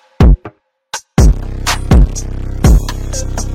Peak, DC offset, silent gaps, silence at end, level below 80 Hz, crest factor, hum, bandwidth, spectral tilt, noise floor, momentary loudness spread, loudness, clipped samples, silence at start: 0 dBFS; under 0.1%; none; 0 s; -12 dBFS; 12 dB; none; 15 kHz; -5.5 dB/octave; -36 dBFS; 12 LU; -14 LUFS; under 0.1%; 0.2 s